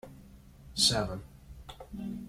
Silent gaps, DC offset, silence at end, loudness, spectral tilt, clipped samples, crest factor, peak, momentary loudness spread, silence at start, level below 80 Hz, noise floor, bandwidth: none; under 0.1%; 0 s; -29 LUFS; -2.5 dB/octave; under 0.1%; 26 dB; -10 dBFS; 25 LU; 0.05 s; -52 dBFS; -53 dBFS; 16.5 kHz